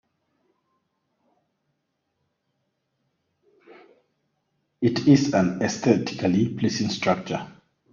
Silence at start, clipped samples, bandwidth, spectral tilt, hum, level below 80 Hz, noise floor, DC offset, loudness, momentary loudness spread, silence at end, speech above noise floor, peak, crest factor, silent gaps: 4.8 s; under 0.1%; 7.4 kHz; -6 dB/octave; none; -62 dBFS; -76 dBFS; under 0.1%; -23 LUFS; 9 LU; 0.45 s; 55 dB; -4 dBFS; 22 dB; none